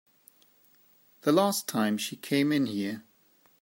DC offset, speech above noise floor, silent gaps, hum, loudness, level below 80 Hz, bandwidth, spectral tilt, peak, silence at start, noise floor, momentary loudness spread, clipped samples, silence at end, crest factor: under 0.1%; 37 dB; none; none; -28 LUFS; -78 dBFS; 16.5 kHz; -4.5 dB/octave; -10 dBFS; 1.25 s; -64 dBFS; 9 LU; under 0.1%; 0.6 s; 20 dB